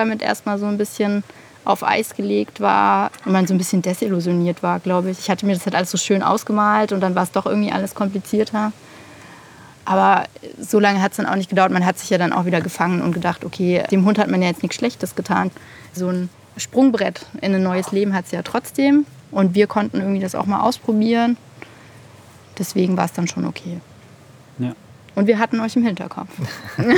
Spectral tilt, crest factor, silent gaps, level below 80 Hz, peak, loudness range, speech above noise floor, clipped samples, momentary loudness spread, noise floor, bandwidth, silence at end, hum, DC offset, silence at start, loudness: -5.5 dB/octave; 18 dB; none; -62 dBFS; 0 dBFS; 4 LU; 26 dB; under 0.1%; 11 LU; -45 dBFS; 18.5 kHz; 0 s; none; under 0.1%; 0 s; -19 LUFS